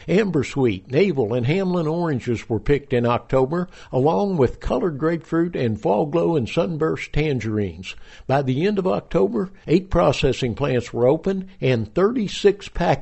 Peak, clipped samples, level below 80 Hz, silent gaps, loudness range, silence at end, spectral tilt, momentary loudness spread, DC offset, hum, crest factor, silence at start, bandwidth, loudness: -4 dBFS; under 0.1%; -38 dBFS; none; 2 LU; 0 s; -7 dB/octave; 5 LU; under 0.1%; none; 16 dB; 0 s; 8.2 kHz; -21 LUFS